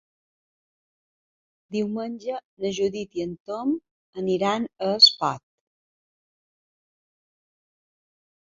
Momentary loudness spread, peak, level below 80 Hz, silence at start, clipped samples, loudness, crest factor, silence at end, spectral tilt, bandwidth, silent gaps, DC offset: 17 LU; -4 dBFS; -68 dBFS; 1.7 s; under 0.1%; -23 LUFS; 26 dB; 3.15 s; -4 dB/octave; 7.8 kHz; 2.45-2.57 s, 3.40-3.45 s, 3.91-4.13 s; under 0.1%